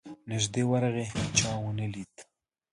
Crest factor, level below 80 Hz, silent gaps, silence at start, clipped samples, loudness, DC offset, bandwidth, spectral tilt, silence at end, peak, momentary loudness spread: 22 dB; -54 dBFS; none; 0.05 s; under 0.1%; -29 LUFS; under 0.1%; 11.5 kHz; -4 dB/octave; 0.5 s; -10 dBFS; 10 LU